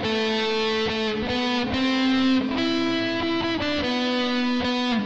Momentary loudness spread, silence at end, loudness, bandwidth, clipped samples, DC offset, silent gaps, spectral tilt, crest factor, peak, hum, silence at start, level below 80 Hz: 3 LU; 0 s; -23 LUFS; 8 kHz; under 0.1%; 0.4%; none; -4.5 dB/octave; 12 dB; -12 dBFS; none; 0 s; -50 dBFS